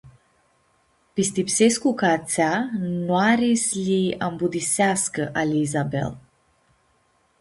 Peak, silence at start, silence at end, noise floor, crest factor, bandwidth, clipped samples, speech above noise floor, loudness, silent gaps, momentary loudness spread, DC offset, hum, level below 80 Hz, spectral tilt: -6 dBFS; 0.05 s; 1.2 s; -64 dBFS; 18 dB; 11.5 kHz; under 0.1%; 43 dB; -22 LUFS; none; 7 LU; under 0.1%; none; -58 dBFS; -4.5 dB/octave